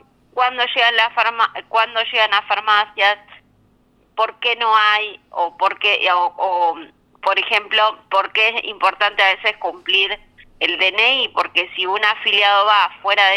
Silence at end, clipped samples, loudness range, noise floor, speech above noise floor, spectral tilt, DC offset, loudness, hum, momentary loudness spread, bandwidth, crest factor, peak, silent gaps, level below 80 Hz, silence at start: 0 s; under 0.1%; 2 LU; -57 dBFS; 40 dB; -1 dB/octave; under 0.1%; -16 LUFS; none; 8 LU; 14 kHz; 16 dB; -2 dBFS; none; -62 dBFS; 0.35 s